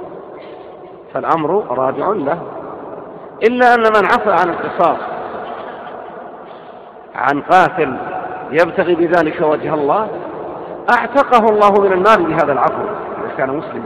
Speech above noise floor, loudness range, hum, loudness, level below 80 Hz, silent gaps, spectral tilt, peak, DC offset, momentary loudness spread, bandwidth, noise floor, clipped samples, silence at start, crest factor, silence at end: 22 dB; 6 LU; none; -14 LUFS; -52 dBFS; none; -6.5 dB/octave; 0 dBFS; under 0.1%; 21 LU; 12.5 kHz; -35 dBFS; under 0.1%; 0 s; 16 dB; 0 s